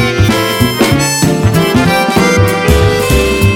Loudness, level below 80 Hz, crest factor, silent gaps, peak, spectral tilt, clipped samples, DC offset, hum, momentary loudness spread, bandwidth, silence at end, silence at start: -10 LUFS; -22 dBFS; 10 dB; none; 0 dBFS; -5 dB/octave; 0.7%; under 0.1%; none; 1 LU; 17.5 kHz; 0 s; 0 s